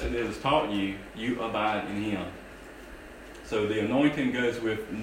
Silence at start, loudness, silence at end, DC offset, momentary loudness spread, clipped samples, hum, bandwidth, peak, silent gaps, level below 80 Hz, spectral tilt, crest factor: 0 s; -29 LUFS; 0 s; under 0.1%; 20 LU; under 0.1%; none; 16 kHz; -12 dBFS; none; -48 dBFS; -6 dB/octave; 18 dB